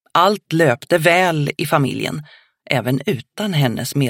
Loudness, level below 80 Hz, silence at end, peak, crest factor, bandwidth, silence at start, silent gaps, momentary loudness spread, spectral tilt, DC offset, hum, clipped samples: -18 LUFS; -62 dBFS; 0 s; 0 dBFS; 18 dB; 17 kHz; 0.15 s; none; 10 LU; -5.5 dB/octave; under 0.1%; none; under 0.1%